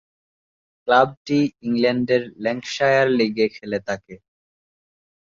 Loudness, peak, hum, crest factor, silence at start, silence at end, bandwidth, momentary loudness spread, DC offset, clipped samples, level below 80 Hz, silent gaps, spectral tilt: -20 LUFS; -4 dBFS; none; 18 dB; 0.85 s; 1.05 s; 7.6 kHz; 10 LU; under 0.1%; under 0.1%; -62 dBFS; 1.17-1.25 s; -5.5 dB/octave